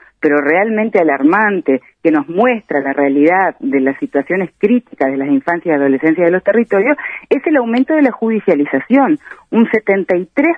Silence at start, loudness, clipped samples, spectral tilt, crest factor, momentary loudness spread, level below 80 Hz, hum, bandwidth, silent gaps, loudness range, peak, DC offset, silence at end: 0.2 s; -14 LUFS; under 0.1%; -8.5 dB/octave; 14 dB; 5 LU; -62 dBFS; none; 4.9 kHz; none; 1 LU; 0 dBFS; under 0.1%; 0 s